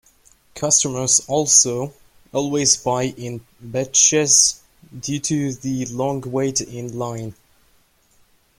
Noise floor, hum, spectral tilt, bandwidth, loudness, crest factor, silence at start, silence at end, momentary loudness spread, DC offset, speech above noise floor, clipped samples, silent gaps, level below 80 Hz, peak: -58 dBFS; none; -2.5 dB/octave; 16.5 kHz; -18 LUFS; 22 dB; 0.55 s; 1.25 s; 19 LU; under 0.1%; 38 dB; under 0.1%; none; -54 dBFS; 0 dBFS